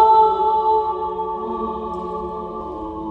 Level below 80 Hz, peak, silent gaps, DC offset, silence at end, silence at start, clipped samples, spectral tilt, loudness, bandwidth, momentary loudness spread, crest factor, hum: -46 dBFS; -4 dBFS; none; under 0.1%; 0 s; 0 s; under 0.1%; -8 dB/octave; -21 LUFS; 4.6 kHz; 14 LU; 16 dB; none